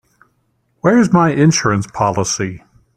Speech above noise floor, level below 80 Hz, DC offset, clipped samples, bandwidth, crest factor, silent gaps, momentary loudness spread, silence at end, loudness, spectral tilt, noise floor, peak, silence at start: 49 dB; -48 dBFS; under 0.1%; under 0.1%; 11.5 kHz; 14 dB; none; 8 LU; 0.4 s; -14 LUFS; -5 dB/octave; -63 dBFS; -2 dBFS; 0.85 s